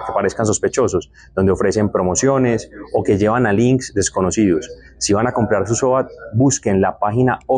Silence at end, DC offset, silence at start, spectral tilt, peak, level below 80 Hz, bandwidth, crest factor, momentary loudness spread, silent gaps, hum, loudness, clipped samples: 0 s; under 0.1%; 0 s; -5.5 dB/octave; -4 dBFS; -44 dBFS; 10 kHz; 12 dB; 7 LU; none; none; -17 LUFS; under 0.1%